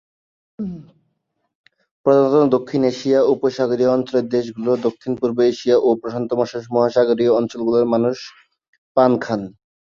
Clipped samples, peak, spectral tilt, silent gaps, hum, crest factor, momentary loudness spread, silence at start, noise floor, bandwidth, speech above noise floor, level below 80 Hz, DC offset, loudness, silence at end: under 0.1%; -2 dBFS; -7 dB/octave; 1.55-1.64 s, 1.91-2.04 s, 8.68-8.95 s; none; 16 dB; 11 LU; 0.6 s; -72 dBFS; 7.4 kHz; 54 dB; -60 dBFS; under 0.1%; -18 LUFS; 0.45 s